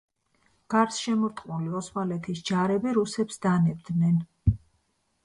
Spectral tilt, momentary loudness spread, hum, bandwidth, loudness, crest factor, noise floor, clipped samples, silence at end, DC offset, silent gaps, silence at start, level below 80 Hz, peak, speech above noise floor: -6.5 dB/octave; 7 LU; none; 11 kHz; -27 LUFS; 18 dB; -72 dBFS; under 0.1%; 0.65 s; under 0.1%; none; 0.7 s; -44 dBFS; -10 dBFS; 46 dB